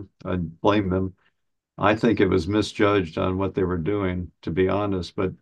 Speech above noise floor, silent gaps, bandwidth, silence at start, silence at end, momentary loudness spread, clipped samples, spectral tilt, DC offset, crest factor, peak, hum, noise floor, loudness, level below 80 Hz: 51 dB; none; 10 kHz; 0 s; 0.05 s; 9 LU; under 0.1%; -7 dB/octave; under 0.1%; 20 dB; -4 dBFS; none; -74 dBFS; -24 LUFS; -48 dBFS